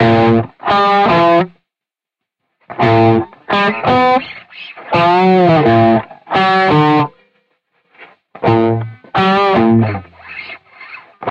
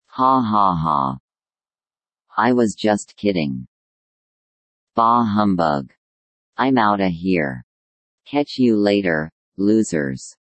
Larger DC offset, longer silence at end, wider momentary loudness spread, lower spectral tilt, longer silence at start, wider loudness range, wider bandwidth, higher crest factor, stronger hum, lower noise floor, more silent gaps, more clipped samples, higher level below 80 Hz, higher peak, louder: neither; second, 0 s vs 0.25 s; first, 20 LU vs 11 LU; first, -8 dB/octave vs -6 dB/octave; second, 0 s vs 0.15 s; about the same, 3 LU vs 3 LU; second, 7.8 kHz vs 8.8 kHz; about the same, 14 dB vs 18 dB; neither; second, -86 dBFS vs under -90 dBFS; second, none vs 1.20-1.28 s, 3.68-4.87 s, 5.97-6.53 s, 7.63-8.18 s, 9.32-9.52 s; neither; first, -46 dBFS vs -54 dBFS; about the same, 0 dBFS vs -2 dBFS; first, -12 LUFS vs -19 LUFS